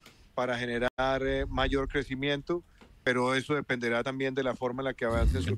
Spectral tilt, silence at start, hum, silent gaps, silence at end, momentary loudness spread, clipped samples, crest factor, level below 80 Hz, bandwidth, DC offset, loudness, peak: -6 dB/octave; 0.05 s; none; 0.90-0.97 s; 0 s; 5 LU; under 0.1%; 16 dB; -40 dBFS; 12.5 kHz; under 0.1%; -30 LUFS; -14 dBFS